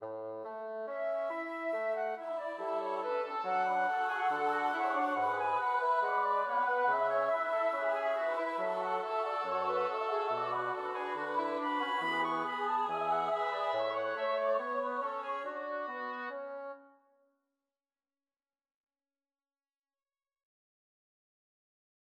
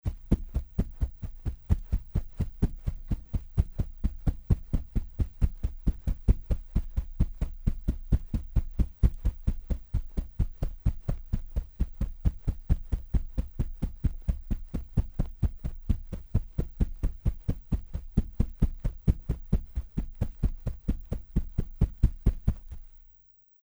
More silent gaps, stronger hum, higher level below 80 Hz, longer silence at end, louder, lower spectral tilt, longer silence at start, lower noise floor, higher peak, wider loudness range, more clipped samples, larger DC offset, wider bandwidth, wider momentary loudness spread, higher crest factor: neither; neither; second, under -90 dBFS vs -30 dBFS; first, 5.2 s vs 0.65 s; about the same, -34 LUFS vs -33 LUFS; second, -4.5 dB/octave vs -9.5 dB/octave; about the same, 0 s vs 0.05 s; first, under -90 dBFS vs -59 dBFS; second, -20 dBFS vs -8 dBFS; first, 9 LU vs 2 LU; neither; neither; second, 12.5 kHz vs over 20 kHz; about the same, 8 LU vs 7 LU; second, 14 dB vs 20 dB